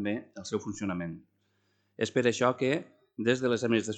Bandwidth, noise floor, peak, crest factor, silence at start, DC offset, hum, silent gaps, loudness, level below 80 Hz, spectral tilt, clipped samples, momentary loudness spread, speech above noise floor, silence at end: 9.2 kHz; -73 dBFS; -10 dBFS; 20 dB; 0 s; under 0.1%; none; none; -30 LUFS; -70 dBFS; -5 dB/octave; under 0.1%; 10 LU; 44 dB; 0 s